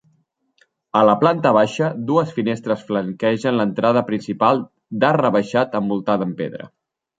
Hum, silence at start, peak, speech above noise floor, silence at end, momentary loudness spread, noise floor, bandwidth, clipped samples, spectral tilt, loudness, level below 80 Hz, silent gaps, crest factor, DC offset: none; 0.95 s; -2 dBFS; 46 dB; 0.55 s; 8 LU; -64 dBFS; 9 kHz; under 0.1%; -7 dB/octave; -19 LUFS; -64 dBFS; none; 18 dB; under 0.1%